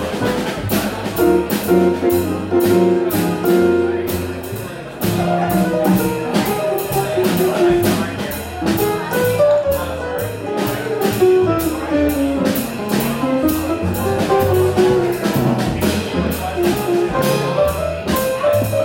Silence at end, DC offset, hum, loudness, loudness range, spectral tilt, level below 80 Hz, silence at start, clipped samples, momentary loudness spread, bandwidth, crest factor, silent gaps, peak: 0 s; under 0.1%; none; -17 LUFS; 2 LU; -6 dB/octave; -38 dBFS; 0 s; under 0.1%; 7 LU; 17 kHz; 14 dB; none; -2 dBFS